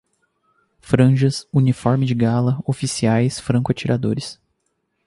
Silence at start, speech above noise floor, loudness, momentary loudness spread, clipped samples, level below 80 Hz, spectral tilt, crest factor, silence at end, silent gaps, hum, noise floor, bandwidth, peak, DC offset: 0.85 s; 53 dB; -19 LUFS; 7 LU; under 0.1%; -50 dBFS; -6.5 dB/octave; 18 dB; 0.75 s; none; none; -71 dBFS; 11.5 kHz; 0 dBFS; under 0.1%